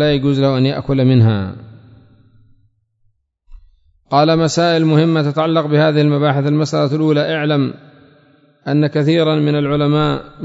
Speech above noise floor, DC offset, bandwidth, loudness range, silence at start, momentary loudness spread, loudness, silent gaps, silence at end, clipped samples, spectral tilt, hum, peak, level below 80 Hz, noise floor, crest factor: 47 dB; under 0.1%; 8 kHz; 6 LU; 0 s; 6 LU; -15 LUFS; none; 0 s; under 0.1%; -7 dB/octave; none; 0 dBFS; -46 dBFS; -61 dBFS; 14 dB